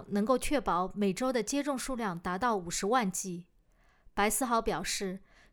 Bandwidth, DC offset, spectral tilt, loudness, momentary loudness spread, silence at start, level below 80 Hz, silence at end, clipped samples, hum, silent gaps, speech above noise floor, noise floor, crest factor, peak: over 20 kHz; under 0.1%; -4 dB/octave; -31 LUFS; 8 LU; 0 s; -52 dBFS; 0.35 s; under 0.1%; none; none; 34 dB; -65 dBFS; 18 dB; -14 dBFS